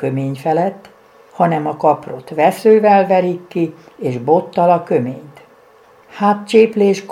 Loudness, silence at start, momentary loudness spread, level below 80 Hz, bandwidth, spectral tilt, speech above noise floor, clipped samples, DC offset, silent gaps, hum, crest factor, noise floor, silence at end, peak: -15 LUFS; 0 s; 11 LU; -66 dBFS; 15 kHz; -7 dB/octave; 32 dB; under 0.1%; under 0.1%; none; none; 16 dB; -47 dBFS; 0 s; 0 dBFS